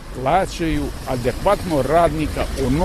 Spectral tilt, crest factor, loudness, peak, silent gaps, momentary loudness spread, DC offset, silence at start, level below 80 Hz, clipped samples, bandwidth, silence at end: -6 dB/octave; 16 dB; -20 LUFS; -4 dBFS; none; 7 LU; under 0.1%; 0 s; -30 dBFS; under 0.1%; 13.5 kHz; 0 s